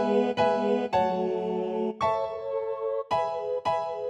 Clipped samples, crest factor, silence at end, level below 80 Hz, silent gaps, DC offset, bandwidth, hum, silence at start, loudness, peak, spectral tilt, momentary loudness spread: under 0.1%; 14 dB; 0 s; -64 dBFS; none; under 0.1%; 8.8 kHz; none; 0 s; -28 LUFS; -12 dBFS; -6.5 dB/octave; 6 LU